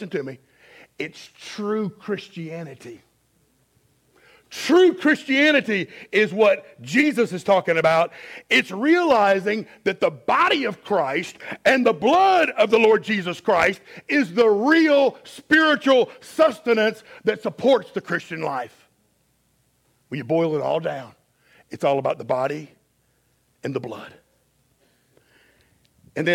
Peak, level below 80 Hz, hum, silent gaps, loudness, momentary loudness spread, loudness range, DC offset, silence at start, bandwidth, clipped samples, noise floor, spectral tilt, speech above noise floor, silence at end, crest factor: -4 dBFS; -66 dBFS; none; none; -20 LUFS; 17 LU; 13 LU; under 0.1%; 0 s; 16 kHz; under 0.1%; -65 dBFS; -5 dB/octave; 45 dB; 0 s; 18 dB